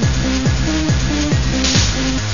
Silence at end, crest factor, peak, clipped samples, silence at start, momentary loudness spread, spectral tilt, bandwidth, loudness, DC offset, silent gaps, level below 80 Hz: 0 s; 16 dB; 0 dBFS; under 0.1%; 0 s; 3 LU; -4.5 dB/octave; 7.4 kHz; -16 LUFS; 3%; none; -22 dBFS